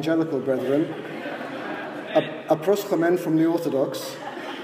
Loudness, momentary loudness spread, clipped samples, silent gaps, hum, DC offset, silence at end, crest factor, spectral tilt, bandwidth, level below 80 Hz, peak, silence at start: -25 LUFS; 11 LU; under 0.1%; none; none; under 0.1%; 0 s; 16 dB; -6 dB/octave; 16 kHz; -78 dBFS; -8 dBFS; 0 s